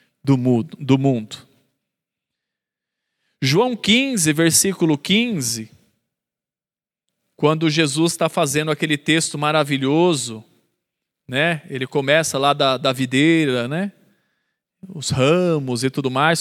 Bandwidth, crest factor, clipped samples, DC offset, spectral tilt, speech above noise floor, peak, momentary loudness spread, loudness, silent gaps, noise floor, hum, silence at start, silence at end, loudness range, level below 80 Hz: 16 kHz; 20 dB; under 0.1%; under 0.1%; -4 dB/octave; over 72 dB; -2 dBFS; 9 LU; -18 LUFS; none; under -90 dBFS; none; 0.25 s; 0 s; 4 LU; -60 dBFS